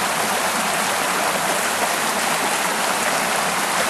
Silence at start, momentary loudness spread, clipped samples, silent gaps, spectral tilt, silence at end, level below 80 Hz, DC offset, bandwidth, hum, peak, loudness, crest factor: 0 s; 0 LU; under 0.1%; none; -1 dB/octave; 0 s; -58 dBFS; under 0.1%; 13 kHz; none; -6 dBFS; -19 LUFS; 16 dB